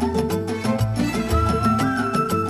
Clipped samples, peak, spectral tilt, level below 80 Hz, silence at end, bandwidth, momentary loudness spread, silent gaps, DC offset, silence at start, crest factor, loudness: under 0.1%; -8 dBFS; -6.5 dB/octave; -32 dBFS; 0 s; 14 kHz; 4 LU; none; under 0.1%; 0 s; 12 dB; -21 LUFS